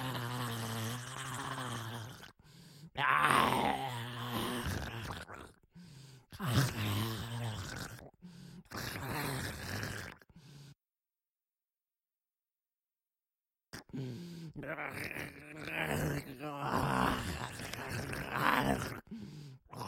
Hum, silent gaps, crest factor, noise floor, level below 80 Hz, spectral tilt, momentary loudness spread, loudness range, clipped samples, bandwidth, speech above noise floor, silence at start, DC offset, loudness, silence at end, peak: none; none; 26 dB; under -90 dBFS; -58 dBFS; -4.5 dB/octave; 22 LU; 13 LU; under 0.1%; 16.5 kHz; over 51 dB; 0 s; under 0.1%; -37 LUFS; 0 s; -12 dBFS